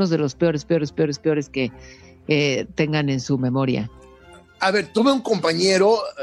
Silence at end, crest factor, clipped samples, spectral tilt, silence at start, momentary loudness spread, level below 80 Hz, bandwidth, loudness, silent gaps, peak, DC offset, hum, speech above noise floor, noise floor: 0 s; 16 dB; under 0.1%; -5.5 dB/octave; 0 s; 8 LU; -54 dBFS; 11.5 kHz; -21 LUFS; none; -6 dBFS; under 0.1%; none; 27 dB; -47 dBFS